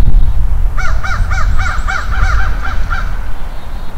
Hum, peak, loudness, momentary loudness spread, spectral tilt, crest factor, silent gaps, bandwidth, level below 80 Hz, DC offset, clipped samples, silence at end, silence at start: none; 0 dBFS; -18 LUFS; 10 LU; -5 dB/octave; 8 dB; none; 8.2 kHz; -12 dBFS; under 0.1%; 1%; 0 s; 0 s